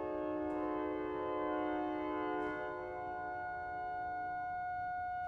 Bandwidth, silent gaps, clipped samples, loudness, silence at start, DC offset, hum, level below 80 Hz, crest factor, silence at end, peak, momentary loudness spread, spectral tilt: 6.2 kHz; none; under 0.1%; -40 LUFS; 0 s; under 0.1%; none; -64 dBFS; 14 dB; 0 s; -26 dBFS; 5 LU; -7.5 dB/octave